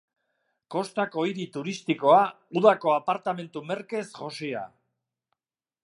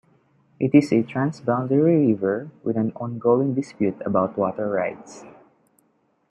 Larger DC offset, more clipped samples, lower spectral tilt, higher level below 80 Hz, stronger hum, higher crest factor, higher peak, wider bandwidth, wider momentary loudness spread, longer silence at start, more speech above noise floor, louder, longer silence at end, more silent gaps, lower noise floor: neither; neither; second, -5.5 dB/octave vs -8.5 dB/octave; second, -82 dBFS vs -66 dBFS; neither; about the same, 22 dB vs 20 dB; about the same, -4 dBFS vs -4 dBFS; first, 11.5 kHz vs 8.6 kHz; first, 14 LU vs 9 LU; about the same, 0.7 s vs 0.6 s; first, over 64 dB vs 45 dB; second, -26 LUFS vs -22 LUFS; first, 1.2 s vs 1 s; neither; first, under -90 dBFS vs -66 dBFS